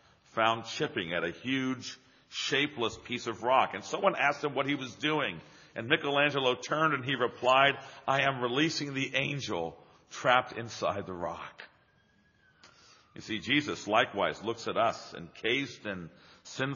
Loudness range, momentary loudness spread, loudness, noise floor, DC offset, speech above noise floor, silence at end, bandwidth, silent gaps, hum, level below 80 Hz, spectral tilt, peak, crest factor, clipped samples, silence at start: 6 LU; 14 LU; -30 LUFS; -67 dBFS; under 0.1%; 36 dB; 0 s; 7.2 kHz; none; none; -70 dBFS; -2 dB/octave; -8 dBFS; 24 dB; under 0.1%; 0.35 s